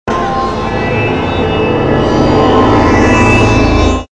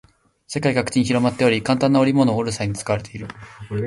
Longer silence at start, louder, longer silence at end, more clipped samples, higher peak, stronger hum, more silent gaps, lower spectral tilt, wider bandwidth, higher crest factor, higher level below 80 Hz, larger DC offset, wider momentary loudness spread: second, 0.05 s vs 0.5 s; first, -10 LUFS vs -20 LUFS; about the same, 0.05 s vs 0 s; neither; about the same, 0 dBFS vs -2 dBFS; neither; neither; about the same, -6.5 dB/octave vs -6 dB/octave; second, 10 kHz vs 11.5 kHz; second, 10 dB vs 18 dB; first, -22 dBFS vs -50 dBFS; first, 1% vs under 0.1%; second, 7 LU vs 17 LU